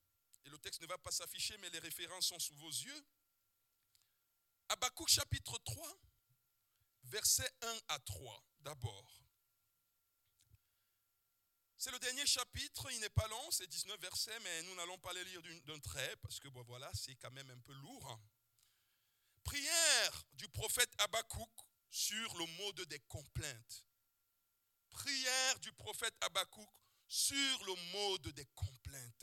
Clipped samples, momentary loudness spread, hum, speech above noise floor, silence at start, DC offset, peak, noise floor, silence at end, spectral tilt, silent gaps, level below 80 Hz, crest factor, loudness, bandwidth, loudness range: under 0.1%; 19 LU; none; 41 dB; 0.45 s; under 0.1%; -16 dBFS; -83 dBFS; 0.1 s; -1 dB/octave; none; -66 dBFS; 28 dB; -40 LUFS; 18 kHz; 12 LU